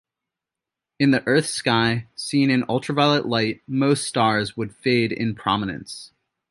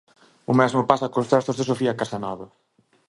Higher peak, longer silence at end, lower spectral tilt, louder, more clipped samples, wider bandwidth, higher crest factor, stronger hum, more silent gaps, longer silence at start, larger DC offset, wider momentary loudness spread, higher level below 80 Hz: second, -4 dBFS vs 0 dBFS; second, 0.45 s vs 0.65 s; second, -5 dB/octave vs -6.5 dB/octave; about the same, -21 LUFS vs -22 LUFS; neither; about the same, 11.5 kHz vs 11.5 kHz; about the same, 18 dB vs 22 dB; neither; neither; first, 1 s vs 0.5 s; neither; second, 8 LU vs 13 LU; about the same, -58 dBFS vs -60 dBFS